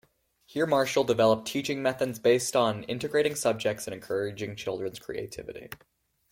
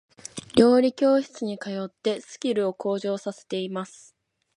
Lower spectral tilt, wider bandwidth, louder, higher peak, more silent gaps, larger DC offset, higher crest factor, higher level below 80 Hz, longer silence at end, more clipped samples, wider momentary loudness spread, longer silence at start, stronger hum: second, -4 dB/octave vs -5.5 dB/octave; first, 16.5 kHz vs 11.5 kHz; second, -28 LUFS vs -25 LUFS; second, -10 dBFS vs -4 dBFS; neither; neither; about the same, 18 dB vs 22 dB; about the same, -64 dBFS vs -62 dBFS; second, 0.55 s vs 0.7 s; neither; about the same, 15 LU vs 15 LU; first, 0.5 s vs 0.35 s; neither